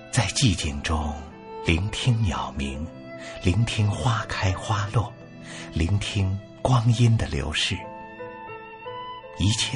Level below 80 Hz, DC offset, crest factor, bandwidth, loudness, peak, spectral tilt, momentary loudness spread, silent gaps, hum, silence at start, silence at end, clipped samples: -38 dBFS; under 0.1%; 18 dB; 11 kHz; -25 LUFS; -6 dBFS; -5 dB/octave; 17 LU; none; none; 0 s; 0 s; under 0.1%